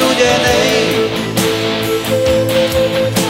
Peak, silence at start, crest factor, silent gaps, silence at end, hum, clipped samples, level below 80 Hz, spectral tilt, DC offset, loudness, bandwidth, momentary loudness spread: 0 dBFS; 0 s; 12 dB; none; 0 s; none; under 0.1%; -36 dBFS; -4 dB/octave; under 0.1%; -13 LUFS; 16.5 kHz; 5 LU